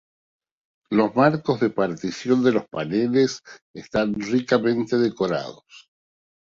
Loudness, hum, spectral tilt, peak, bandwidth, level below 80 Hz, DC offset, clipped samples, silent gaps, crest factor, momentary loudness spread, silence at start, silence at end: -22 LUFS; none; -6 dB/octave; -4 dBFS; 7.6 kHz; -58 dBFS; under 0.1%; under 0.1%; 3.62-3.74 s; 18 dB; 9 LU; 0.9 s; 0.7 s